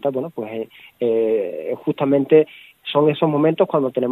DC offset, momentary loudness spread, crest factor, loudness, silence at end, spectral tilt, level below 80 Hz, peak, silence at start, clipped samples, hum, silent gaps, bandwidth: under 0.1%; 13 LU; 18 dB; -19 LUFS; 0 s; -9 dB/octave; -70 dBFS; -2 dBFS; 0.05 s; under 0.1%; none; none; 4.1 kHz